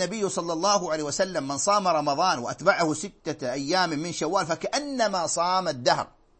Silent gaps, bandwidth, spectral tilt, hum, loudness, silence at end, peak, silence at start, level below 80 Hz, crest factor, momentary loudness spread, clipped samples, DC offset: none; 8.8 kHz; -3 dB/octave; none; -25 LUFS; 0.35 s; -6 dBFS; 0 s; -60 dBFS; 20 dB; 6 LU; under 0.1%; under 0.1%